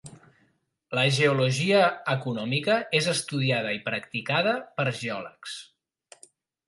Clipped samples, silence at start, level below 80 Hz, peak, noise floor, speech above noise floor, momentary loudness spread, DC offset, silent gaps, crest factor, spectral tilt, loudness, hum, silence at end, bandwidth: under 0.1%; 0.05 s; -70 dBFS; -8 dBFS; -69 dBFS; 43 dB; 12 LU; under 0.1%; none; 20 dB; -4.5 dB/octave; -25 LUFS; none; 1.05 s; 11.5 kHz